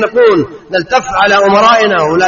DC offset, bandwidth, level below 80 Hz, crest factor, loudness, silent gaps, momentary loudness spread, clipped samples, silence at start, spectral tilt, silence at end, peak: under 0.1%; 7.4 kHz; -42 dBFS; 10 dB; -9 LUFS; none; 8 LU; under 0.1%; 0 s; -4 dB/octave; 0 s; 0 dBFS